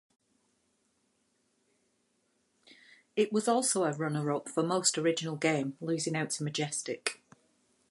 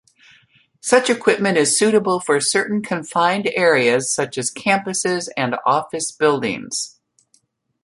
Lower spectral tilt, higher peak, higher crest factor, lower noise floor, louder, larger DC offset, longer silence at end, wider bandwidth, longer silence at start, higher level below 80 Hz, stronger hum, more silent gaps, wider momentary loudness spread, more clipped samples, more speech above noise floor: about the same, -4 dB/octave vs -3 dB/octave; second, -10 dBFS vs 0 dBFS; about the same, 24 dB vs 20 dB; first, -75 dBFS vs -62 dBFS; second, -31 LUFS vs -18 LUFS; neither; second, 0.75 s vs 0.95 s; about the same, 11.5 kHz vs 11.5 kHz; first, 3.15 s vs 0.85 s; second, -82 dBFS vs -64 dBFS; neither; neither; about the same, 7 LU vs 8 LU; neither; about the same, 44 dB vs 44 dB